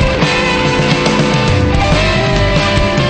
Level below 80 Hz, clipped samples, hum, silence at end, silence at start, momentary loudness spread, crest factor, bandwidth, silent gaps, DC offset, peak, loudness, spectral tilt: -22 dBFS; under 0.1%; none; 0 s; 0 s; 1 LU; 10 dB; 9.2 kHz; none; under 0.1%; 0 dBFS; -12 LUFS; -5 dB/octave